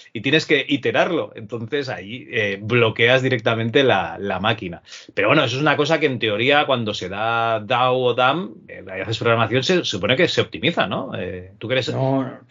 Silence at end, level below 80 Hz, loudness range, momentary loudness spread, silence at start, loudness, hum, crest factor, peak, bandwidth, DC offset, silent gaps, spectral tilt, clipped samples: 0.15 s; -64 dBFS; 2 LU; 12 LU; 0.15 s; -19 LUFS; none; 20 dB; 0 dBFS; 7.6 kHz; under 0.1%; none; -3 dB/octave; under 0.1%